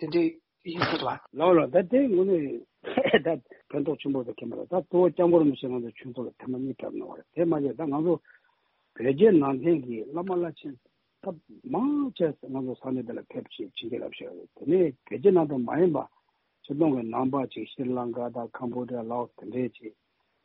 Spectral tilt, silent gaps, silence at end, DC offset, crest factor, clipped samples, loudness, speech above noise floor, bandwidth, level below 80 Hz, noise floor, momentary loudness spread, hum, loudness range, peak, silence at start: -5.5 dB/octave; none; 0.55 s; under 0.1%; 20 dB; under 0.1%; -27 LUFS; 44 dB; 5.6 kHz; -68 dBFS; -71 dBFS; 16 LU; none; 7 LU; -6 dBFS; 0 s